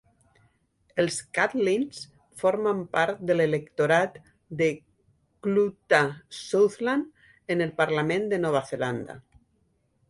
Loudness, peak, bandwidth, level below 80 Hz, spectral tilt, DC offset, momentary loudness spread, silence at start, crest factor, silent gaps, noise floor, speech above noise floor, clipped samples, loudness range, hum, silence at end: -26 LUFS; -8 dBFS; 11.5 kHz; -66 dBFS; -5 dB/octave; under 0.1%; 16 LU; 0.95 s; 20 dB; none; -69 dBFS; 44 dB; under 0.1%; 2 LU; none; 0.9 s